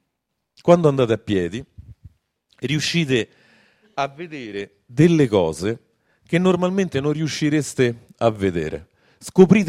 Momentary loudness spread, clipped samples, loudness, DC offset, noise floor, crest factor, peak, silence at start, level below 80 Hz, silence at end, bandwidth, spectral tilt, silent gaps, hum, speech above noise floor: 16 LU; under 0.1%; -20 LUFS; under 0.1%; -77 dBFS; 20 dB; 0 dBFS; 0.65 s; -54 dBFS; 0 s; 13 kHz; -6 dB/octave; none; none; 58 dB